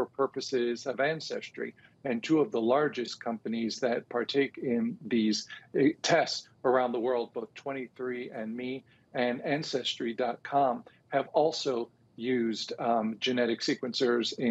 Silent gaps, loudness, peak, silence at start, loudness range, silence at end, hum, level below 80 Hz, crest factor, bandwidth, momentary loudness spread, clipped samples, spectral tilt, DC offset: none; -31 LUFS; -12 dBFS; 0 s; 4 LU; 0 s; none; -78 dBFS; 18 dB; 8.2 kHz; 11 LU; under 0.1%; -4.5 dB/octave; under 0.1%